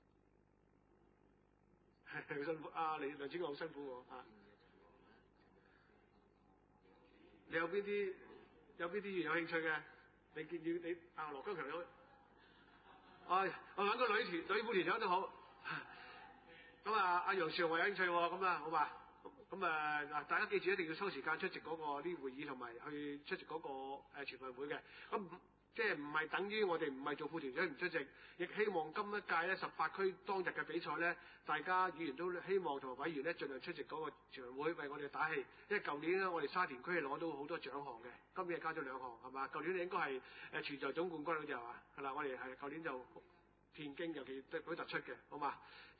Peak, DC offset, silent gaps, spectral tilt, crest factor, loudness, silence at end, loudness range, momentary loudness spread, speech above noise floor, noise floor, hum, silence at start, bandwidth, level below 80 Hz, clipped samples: -24 dBFS; under 0.1%; none; -2 dB/octave; 20 dB; -42 LUFS; 0.05 s; 8 LU; 14 LU; 32 dB; -74 dBFS; none; 2.05 s; 4.8 kHz; -80 dBFS; under 0.1%